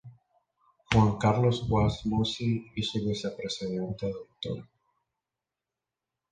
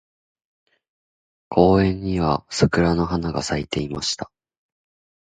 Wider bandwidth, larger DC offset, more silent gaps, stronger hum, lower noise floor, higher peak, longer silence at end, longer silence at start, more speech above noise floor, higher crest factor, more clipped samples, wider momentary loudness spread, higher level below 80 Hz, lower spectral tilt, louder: about the same, 9.4 kHz vs 9.4 kHz; neither; neither; neither; about the same, -89 dBFS vs under -90 dBFS; second, -6 dBFS vs 0 dBFS; first, 1.7 s vs 1.05 s; second, 0.05 s vs 1.5 s; second, 61 dB vs over 70 dB; about the same, 24 dB vs 22 dB; neither; first, 12 LU vs 9 LU; second, -48 dBFS vs -40 dBFS; about the same, -6.5 dB/octave vs -5.5 dB/octave; second, -29 LUFS vs -21 LUFS